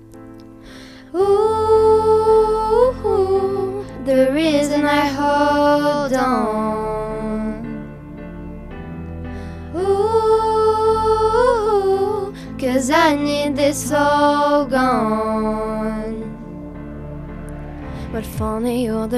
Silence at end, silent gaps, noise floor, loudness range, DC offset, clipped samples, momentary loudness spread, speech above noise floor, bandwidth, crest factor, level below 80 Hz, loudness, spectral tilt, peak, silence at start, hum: 0 s; none; -38 dBFS; 9 LU; under 0.1%; under 0.1%; 17 LU; 21 dB; 14.5 kHz; 18 dB; -38 dBFS; -17 LUFS; -5.5 dB/octave; 0 dBFS; 0 s; none